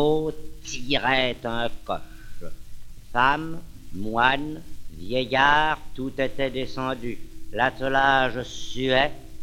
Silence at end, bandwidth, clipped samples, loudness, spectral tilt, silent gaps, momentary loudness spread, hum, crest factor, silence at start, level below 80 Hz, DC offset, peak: 0 s; 15 kHz; under 0.1%; -24 LUFS; -4.5 dB/octave; none; 20 LU; none; 22 dB; 0 s; -40 dBFS; under 0.1%; -2 dBFS